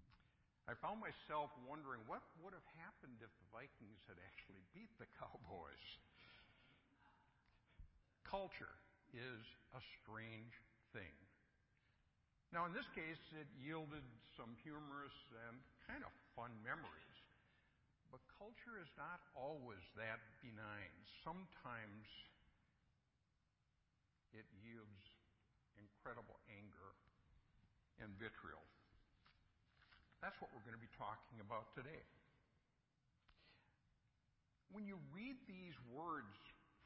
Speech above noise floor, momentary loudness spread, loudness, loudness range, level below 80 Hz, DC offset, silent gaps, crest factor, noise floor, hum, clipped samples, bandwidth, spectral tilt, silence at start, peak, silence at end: 30 dB; 14 LU; -55 LUFS; 10 LU; -78 dBFS; under 0.1%; none; 26 dB; -86 dBFS; none; under 0.1%; 5.6 kHz; -3.5 dB/octave; 0 s; -32 dBFS; 0 s